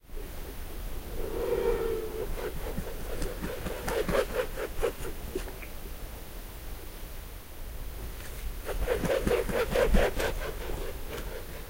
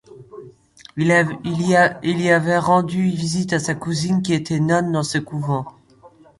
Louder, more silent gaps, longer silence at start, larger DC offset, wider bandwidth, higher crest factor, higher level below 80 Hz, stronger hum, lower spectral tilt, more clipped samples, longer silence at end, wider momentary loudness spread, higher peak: second, -34 LUFS vs -19 LUFS; neither; about the same, 0.05 s vs 0.1 s; neither; first, 16 kHz vs 11.5 kHz; first, 22 dB vs 16 dB; first, -36 dBFS vs -54 dBFS; neither; about the same, -5 dB/octave vs -5.5 dB/octave; neither; second, 0 s vs 0.7 s; first, 15 LU vs 8 LU; second, -10 dBFS vs -2 dBFS